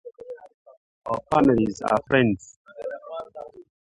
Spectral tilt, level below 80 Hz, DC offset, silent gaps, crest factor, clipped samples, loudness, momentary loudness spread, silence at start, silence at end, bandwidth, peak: -6.5 dB/octave; -54 dBFS; under 0.1%; 0.54-0.65 s, 0.77-1.02 s, 2.56-2.65 s; 20 dB; under 0.1%; -22 LUFS; 22 LU; 0.05 s; 0.2 s; 11 kHz; -4 dBFS